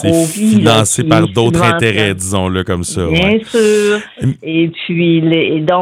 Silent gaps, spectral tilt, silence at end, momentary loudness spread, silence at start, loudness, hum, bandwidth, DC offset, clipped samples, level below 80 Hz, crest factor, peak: none; -5 dB/octave; 0 s; 6 LU; 0 s; -12 LUFS; none; 16 kHz; under 0.1%; 0.3%; -42 dBFS; 12 dB; 0 dBFS